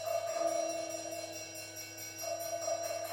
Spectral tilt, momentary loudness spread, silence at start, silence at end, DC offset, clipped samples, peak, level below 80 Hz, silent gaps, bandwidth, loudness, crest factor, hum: -1.5 dB/octave; 9 LU; 0 s; 0 s; under 0.1%; under 0.1%; -22 dBFS; -80 dBFS; none; 17 kHz; -38 LUFS; 16 dB; none